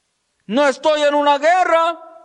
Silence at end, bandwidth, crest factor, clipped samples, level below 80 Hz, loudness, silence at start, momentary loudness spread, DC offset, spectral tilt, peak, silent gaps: 0.2 s; 10 kHz; 12 dB; under 0.1%; -66 dBFS; -16 LUFS; 0.5 s; 5 LU; under 0.1%; -3 dB/octave; -4 dBFS; none